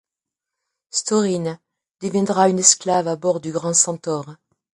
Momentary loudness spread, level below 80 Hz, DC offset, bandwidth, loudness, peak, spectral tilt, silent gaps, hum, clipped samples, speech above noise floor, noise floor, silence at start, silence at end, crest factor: 15 LU; -66 dBFS; under 0.1%; 11.5 kHz; -19 LUFS; 0 dBFS; -3.5 dB/octave; none; none; under 0.1%; 66 dB; -86 dBFS; 0.95 s; 0.45 s; 20 dB